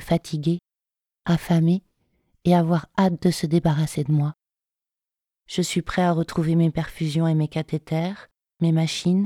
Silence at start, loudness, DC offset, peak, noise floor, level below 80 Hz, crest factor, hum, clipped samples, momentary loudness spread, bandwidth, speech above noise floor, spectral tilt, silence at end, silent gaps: 0 s; -23 LUFS; under 0.1%; -6 dBFS; -89 dBFS; -50 dBFS; 18 dB; none; under 0.1%; 7 LU; 14.5 kHz; 67 dB; -6.5 dB/octave; 0 s; none